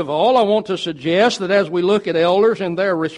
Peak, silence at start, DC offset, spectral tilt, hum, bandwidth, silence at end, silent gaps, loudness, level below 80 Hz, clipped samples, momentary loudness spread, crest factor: -2 dBFS; 0 s; under 0.1%; -5.5 dB/octave; none; 11 kHz; 0 s; none; -17 LUFS; -60 dBFS; under 0.1%; 5 LU; 14 dB